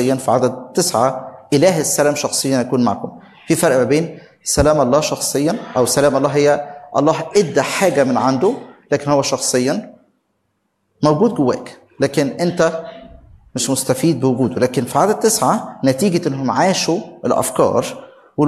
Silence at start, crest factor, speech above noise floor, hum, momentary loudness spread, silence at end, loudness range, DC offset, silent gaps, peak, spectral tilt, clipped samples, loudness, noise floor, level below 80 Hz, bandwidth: 0 s; 16 dB; 52 dB; none; 8 LU; 0 s; 3 LU; under 0.1%; none; 0 dBFS; -4.5 dB/octave; under 0.1%; -16 LUFS; -68 dBFS; -44 dBFS; 13.5 kHz